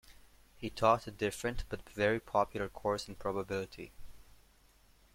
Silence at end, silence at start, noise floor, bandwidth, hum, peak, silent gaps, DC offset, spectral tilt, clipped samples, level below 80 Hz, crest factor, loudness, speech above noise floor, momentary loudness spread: 0.95 s; 0.1 s; -65 dBFS; 16.5 kHz; none; -12 dBFS; none; under 0.1%; -5 dB/octave; under 0.1%; -54 dBFS; 24 dB; -35 LUFS; 30 dB; 15 LU